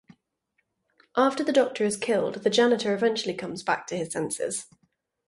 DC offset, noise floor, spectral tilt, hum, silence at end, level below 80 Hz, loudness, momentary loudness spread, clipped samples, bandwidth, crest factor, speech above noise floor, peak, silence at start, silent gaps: under 0.1%; -76 dBFS; -3.5 dB/octave; none; 0.65 s; -70 dBFS; -26 LUFS; 9 LU; under 0.1%; 11.5 kHz; 18 dB; 51 dB; -8 dBFS; 1.15 s; none